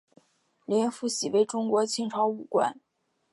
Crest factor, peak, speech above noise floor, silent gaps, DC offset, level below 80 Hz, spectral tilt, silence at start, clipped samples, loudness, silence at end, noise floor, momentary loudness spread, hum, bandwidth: 16 dB; -12 dBFS; 36 dB; none; under 0.1%; -82 dBFS; -4 dB/octave; 0.7 s; under 0.1%; -27 LUFS; 0.55 s; -63 dBFS; 4 LU; none; 11.5 kHz